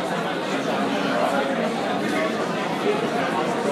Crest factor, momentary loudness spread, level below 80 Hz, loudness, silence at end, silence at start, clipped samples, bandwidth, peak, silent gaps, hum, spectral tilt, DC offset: 14 dB; 3 LU; -66 dBFS; -23 LUFS; 0 s; 0 s; under 0.1%; 15.5 kHz; -10 dBFS; none; none; -5 dB/octave; under 0.1%